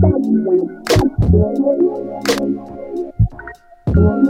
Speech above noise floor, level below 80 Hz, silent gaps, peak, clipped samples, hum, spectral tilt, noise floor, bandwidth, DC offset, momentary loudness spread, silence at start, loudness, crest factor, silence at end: 21 dB; -26 dBFS; none; -2 dBFS; under 0.1%; none; -7 dB/octave; -36 dBFS; 16 kHz; under 0.1%; 12 LU; 0 s; -17 LUFS; 14 dB; 0 s